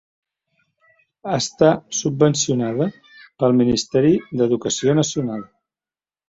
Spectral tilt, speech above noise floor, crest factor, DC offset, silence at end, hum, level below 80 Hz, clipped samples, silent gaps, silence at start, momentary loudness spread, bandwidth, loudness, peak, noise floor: -5 dB/octave; over 72 dB; 18 dB; under 0.1%; 0.85 s; none; -54 dBFS; under 0.1%; none; 1.25 s; 9 LU; 8 kHz; -19 LUFS; -2 dBFS; under -90 dBFS